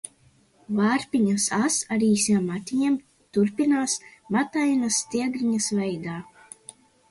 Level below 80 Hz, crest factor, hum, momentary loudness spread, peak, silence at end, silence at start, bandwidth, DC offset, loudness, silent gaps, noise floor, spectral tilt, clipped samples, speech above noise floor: -66 dBFS; 14 dB; none; 13 LU; -10 dBFS; 0.85 s; 0.7 s; 11.5 kHz; under 0.1%; -24 LUFS; none; -60 dBFS; -4 dB/octave; under 0.1%; 36 dB